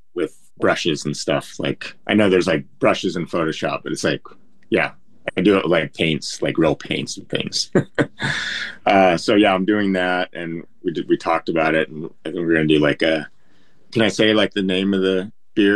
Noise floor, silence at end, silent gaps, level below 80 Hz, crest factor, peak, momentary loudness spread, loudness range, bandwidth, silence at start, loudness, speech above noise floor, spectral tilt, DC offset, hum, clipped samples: -59 dBFS; 0 s; none; -54 dBFS; 18 dB; -2 dBFS; 11 LU; 3 LU; 12 kHz; 0.15 s; -20 LUFS; 40 dB; -5 dB/octave; 0.8%; none; under 0.1%